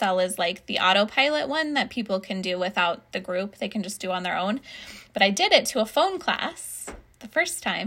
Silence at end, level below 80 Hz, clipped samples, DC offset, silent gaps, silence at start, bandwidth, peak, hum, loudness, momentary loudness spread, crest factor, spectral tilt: 0 s; -60 dBFS; under 0.1%; under 0.1%; none; 0 s; 16 kHz; 0 dBFS; none; -24 LUFS; 14 LU; 24 dB; -3 dB/octave